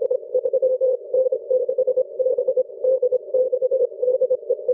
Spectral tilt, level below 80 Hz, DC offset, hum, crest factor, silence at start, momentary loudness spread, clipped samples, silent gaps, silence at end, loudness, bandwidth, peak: -10.5 dB/octave; -72 dBFS; under 0.1%; none; 10 dB; 0 s; 2 LU; under 0.1%; none; 0 s; -21 LUFS; 1.2 kHz; -10 dBFS